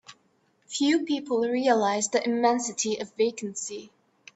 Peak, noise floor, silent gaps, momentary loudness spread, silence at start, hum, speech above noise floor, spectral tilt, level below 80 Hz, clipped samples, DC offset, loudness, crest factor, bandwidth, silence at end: -8 dBFS; -67 dBFS; none; 11 LU; 0.1 s; none; 42 dB; -3 dB/octave; -76 dBFS; under 0.1%; under 0.1%; -26 LUFS; 18 dB; 8.4 kHz; 0.5 s